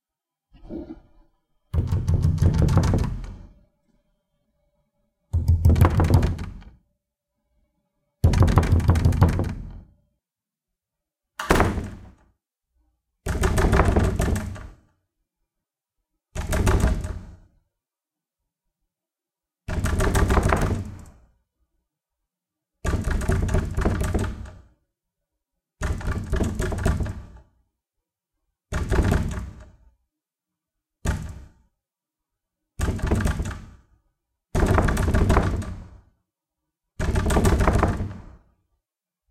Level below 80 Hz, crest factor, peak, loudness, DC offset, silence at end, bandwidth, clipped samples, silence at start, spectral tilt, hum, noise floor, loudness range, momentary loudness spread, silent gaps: -30 dBFS; 24 dB; -2 dBFS; -23 LUFS; under 0.1%; 1 s; 15.5 kHz; under 0.1%; 0.65 s; -6.5 dB/octave; none; -89 dBFS; 7 LU; 19 LU; none